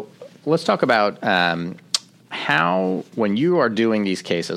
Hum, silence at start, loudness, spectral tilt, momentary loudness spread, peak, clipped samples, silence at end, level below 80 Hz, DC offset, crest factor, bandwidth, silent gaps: none; 0 s; -20 LUFS; -4.5 dB/octave; 9 LU; -2 dBFS; under 0.1%; 0 s; -66 dBFS; under 0.1%; 18 dB; 14.5 kHz; none